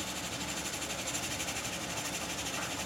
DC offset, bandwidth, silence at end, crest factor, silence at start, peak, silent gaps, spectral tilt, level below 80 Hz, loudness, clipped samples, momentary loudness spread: under 0.1%; 17 kHz; 0 s; 16 dB; 0 s; -20 dBFS; none; -2 dB/octave; -56 dBFS; -35 LUFS; under 0.1%; 1 LU